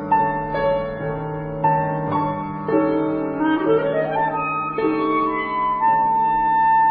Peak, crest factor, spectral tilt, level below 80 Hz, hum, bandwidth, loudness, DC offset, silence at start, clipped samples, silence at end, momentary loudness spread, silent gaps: -6 dBFS; 14 dB; -10.5 dB/octave; -46 dBFS; none; 4.9 kHz; -20 LUFS; under 0.1%; 0 s; under 0.1%; 0 s; 7 LU; none